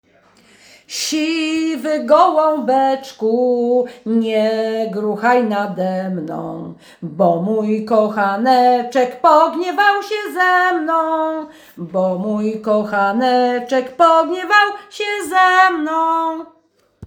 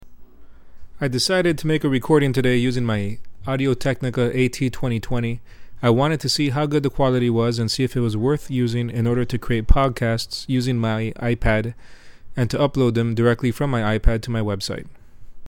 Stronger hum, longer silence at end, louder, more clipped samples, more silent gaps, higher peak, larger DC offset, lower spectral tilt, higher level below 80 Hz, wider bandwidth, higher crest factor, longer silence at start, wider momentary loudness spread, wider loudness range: neither; about the same, 0 s vs 0 s; first, -16 LUFS vs -21 LUFS; neither; neither; about the same, 0 dBFS vs 0 dBFS; neither; second, -4.5 dB/octave vs -6 dB/octave; second, -64 dBFS vs -30 dBFS; first, over 20 kHz vs 16.5 kHz; about the same, 16 dB vs 20 dB; first, 0.9 s vs 0 s; first, 11 LU vs 7 LU; about the same, 4 LU vs 2 LU